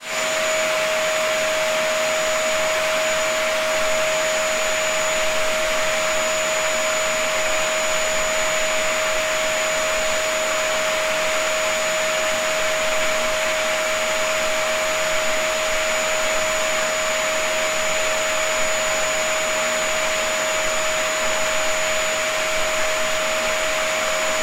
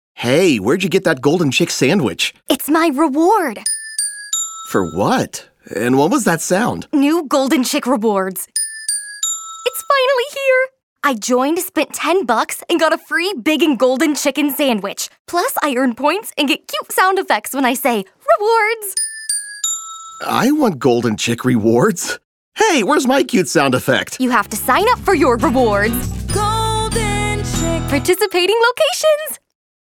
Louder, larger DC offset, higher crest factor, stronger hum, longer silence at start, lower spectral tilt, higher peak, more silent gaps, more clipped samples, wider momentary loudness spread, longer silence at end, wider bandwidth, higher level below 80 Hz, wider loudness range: second, -20 LUFS vs -16 LUFS; neither; about the same, 14 dB vs 16 dB; neither; second, 0 s vs 0.15 s; second, 0 dB/octave vs -4 dB/octave; second, -6 dBFS vs 0 dBFS; second, none vs 10.83-10.96 s, 15.19-15.25 s, 22.24-22.52 s; neither; second, 1 LU vs 6 LU; second, 0 s vs 0.65 s; second, 16 kHz vs 19.5 kHz; second, -44 dBFS vs -38 dBFS; about the same, 0 LU vs 2 LU